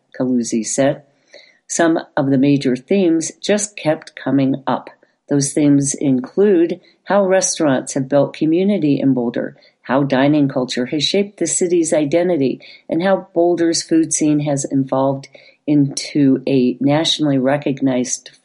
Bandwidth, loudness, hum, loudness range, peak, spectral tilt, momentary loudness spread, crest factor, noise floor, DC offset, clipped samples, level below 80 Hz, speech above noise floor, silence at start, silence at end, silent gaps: 11.5 kHz; -17 LUFS; none; 2 LU; -2 dBFS; -4.5 dB/octave; 6 LU; 14 dB; -47 dBFS; under 0.1%; under 0.1%; -62 dBFS; 30 dB; 0.15 s; 0.25 s; none